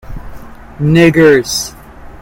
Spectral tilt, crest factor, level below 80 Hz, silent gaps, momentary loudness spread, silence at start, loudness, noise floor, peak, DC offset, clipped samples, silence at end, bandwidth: -5.5 dB/octave; 12 dB; -32 dBFS; none; 23 LU; 0.05 s; -10 LUFS; -30 dBFS; 0 dBFS; under 0.1%; 0.2%; 0.1 s; 17.5 kHz